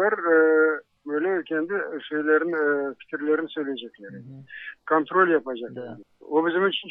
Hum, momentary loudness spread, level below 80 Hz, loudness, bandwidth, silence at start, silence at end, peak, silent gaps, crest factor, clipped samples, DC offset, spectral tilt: none; 20 LU; -78 dBFS; -24 LUFS; 3.9 kHz; 0 s; 0 s; -8 dBFS; none; 16 dB; under 0.1%; under 0.1%; -8.5 dB/octave